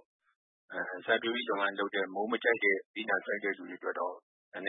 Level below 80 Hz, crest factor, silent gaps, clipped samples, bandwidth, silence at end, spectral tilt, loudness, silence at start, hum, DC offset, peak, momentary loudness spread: under -90 dBFS; 20 dB; 2.86-2.94 s, 4.22-4.52 s; under 0.1%; 4.1 kHz; 0 s; -7 dB/octave; -32 LUFS; 0.7 s; none; under 0.1%; -14 dBFS; 10 LU